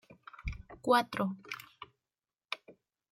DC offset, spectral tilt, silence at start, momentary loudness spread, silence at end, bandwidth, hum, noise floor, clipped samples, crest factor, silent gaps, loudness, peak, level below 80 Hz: under 0.1%; -5 dB/octave; 0.1 s; 24 LU; 0.4 s; 16 kHz; none; under -90 dBFS; under 0.1%; 24 dB; none; -35 LUFS; -14 dBFS; -52 dBFS